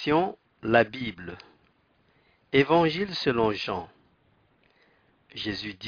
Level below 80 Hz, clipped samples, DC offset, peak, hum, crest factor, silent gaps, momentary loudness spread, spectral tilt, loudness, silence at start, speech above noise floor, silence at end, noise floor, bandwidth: -60 dBFS; under 0.1%; under 0.1%; -6 dBFS; none; 22 dB; none; 20 LU; -6.5 dB/octave; -26 LUFS; 0 s; 40 dB; 0 s; -66 dBFS; 5.4 kHz